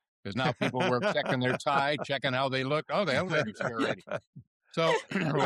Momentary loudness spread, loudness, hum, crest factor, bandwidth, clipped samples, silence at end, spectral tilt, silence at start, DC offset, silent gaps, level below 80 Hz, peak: 6 LU; -29 LUFS; none; 16 dB; 12.5 kHz; under 0.1%; 0 s; -5.5 dB/octave; 0.25 s; under 0.1%; 4.27-4.33 s, 4.47-4.60 s; -68 dBFS; -14 dBFS